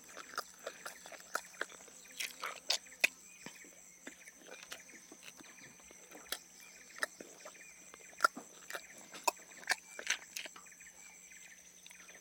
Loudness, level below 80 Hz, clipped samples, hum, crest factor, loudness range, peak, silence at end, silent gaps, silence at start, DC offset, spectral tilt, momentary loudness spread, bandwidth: -41 LUFS; -84 dBFS; under 0.1%; none; 32 dB; 10 LU; -12 dBFS; 0 s; none; 0 s; under 0.1%; 0.5 dB/octave; 19 LU; 17.5 kHz